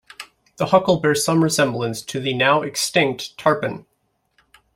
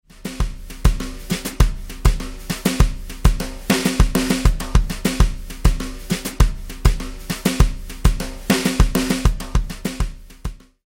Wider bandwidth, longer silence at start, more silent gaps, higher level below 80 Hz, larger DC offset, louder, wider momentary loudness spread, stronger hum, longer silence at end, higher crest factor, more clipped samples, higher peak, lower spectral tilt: about the same, 16.5 kHz vs 16.5 kHz; about the same, 0.2 s vs 0.15 s; neither; second, -58 dBFS vs -20 dBFS; neither; about the same, -19 LUFS vs -21 LUFS; first, 14 LU vs 10 LU; neither; first, 0.95 s vs 0.3 s; about the same, 20 dB vs 18 dB; neither; about the same, -2 dBFS vs 0 dBFS; about the same, -4 dB/octave vs -5 dB/octave